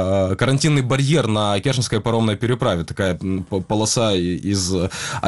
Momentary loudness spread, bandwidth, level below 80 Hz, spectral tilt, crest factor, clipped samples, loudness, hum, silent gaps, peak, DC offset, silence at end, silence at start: 5 LU; 12 kHz; -44 dBFS; -5 dB/octave; 18 dB; under 0.1%; -19 LUFS; none; none; -2 dBFS; 0.3%; 0 s; 0 s